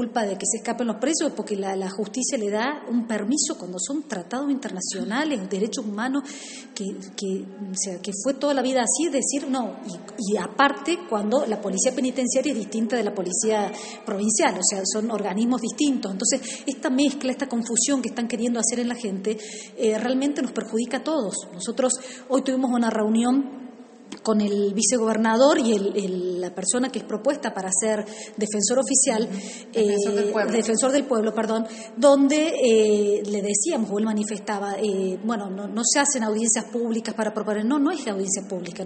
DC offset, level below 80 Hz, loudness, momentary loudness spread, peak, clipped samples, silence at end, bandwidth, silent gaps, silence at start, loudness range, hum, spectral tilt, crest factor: under 0.1%; -70 dBFS; -23 LUFS; 10 LU; -4 dBFS; under 0.1%; 0 s; 8.8 kHz; none; 0 s; 5 LU; none; -3.5 dB/octave; 20 dB